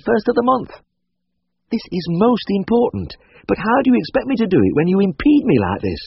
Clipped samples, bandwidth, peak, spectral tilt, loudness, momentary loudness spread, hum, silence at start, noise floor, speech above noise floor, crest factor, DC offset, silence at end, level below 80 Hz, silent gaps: under 0.1%; 6 kHz; -2 dBFS; -6 dB/octave; -17 LUFS; 11 LU; none; 0.05 s; -74 dBFS; 58 dB; 14 dB; under 0.1%; 0 s; -44 dBFS; none